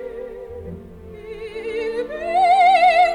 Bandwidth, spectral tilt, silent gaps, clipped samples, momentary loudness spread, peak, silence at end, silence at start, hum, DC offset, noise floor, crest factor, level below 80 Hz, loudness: 10.5 kHz; -4 dB/octave; none; under 0.1%; 24 LU; -4 dBFS; 0 s; 0 s; none; under 0.1%; -38 dBFS; 14 dB; -48 dBFS; -17 LUFS